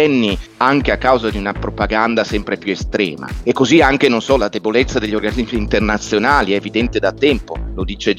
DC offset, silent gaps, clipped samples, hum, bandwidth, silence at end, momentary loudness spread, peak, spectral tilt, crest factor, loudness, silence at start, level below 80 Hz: under 0.1%; none; under 0.1%; none; 14 kHz; 0 s; 8 LU; 0 dBFS; -5 dB/octave; 16 dB; -16 LUFS; 0 s; -30 dBFS